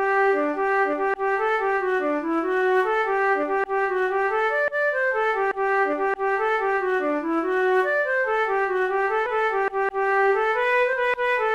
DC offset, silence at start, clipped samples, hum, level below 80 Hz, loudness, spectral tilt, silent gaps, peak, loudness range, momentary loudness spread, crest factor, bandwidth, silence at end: 0.1%; 0 s; under 0.1%; none; -56 dBFS; -22 LUFS; -4 dB/octave; none; -10 dBFS; 1 LU; 3 LU; 12 dB; 7.8 kHz; 0 s